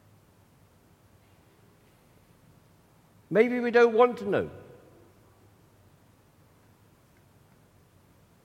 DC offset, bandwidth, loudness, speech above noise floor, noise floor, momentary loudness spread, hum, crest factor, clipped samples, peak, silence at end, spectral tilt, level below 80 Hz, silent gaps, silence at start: under 0.1%; 8.6 kHz; -24 LUFS; 37 dB; -60 dBFS; 14 LU; none; 24 dB; under 0.1%; -8 dBFS; 3.85 s; -6.5 dB/octave; -70 dBFS; none; 3.3 s